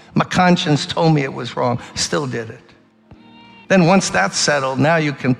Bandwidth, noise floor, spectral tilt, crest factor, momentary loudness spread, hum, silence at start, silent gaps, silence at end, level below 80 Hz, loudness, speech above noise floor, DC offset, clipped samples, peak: 12 kHz; -47 dBFS; -4.5 dB/octave; 16 dB; 8 LU; none; 0.15 s; none; 0 s; -52 dBFS; -16 LUFS; 30 dB; under 0.1%; under 0.1%; -2 dBFS